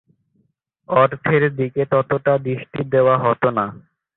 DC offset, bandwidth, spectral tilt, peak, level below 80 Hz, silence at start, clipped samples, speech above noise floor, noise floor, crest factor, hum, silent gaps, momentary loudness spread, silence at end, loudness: under 0.1%; 4.1 kHz; -12 dB/octave; -2 dBFS; -56 dBFS; 0.9 s; under 0.1%; 48 dB; -66 dBFS; 18 dB; none; none; 8 LU; 0.4 s; -18 LUFS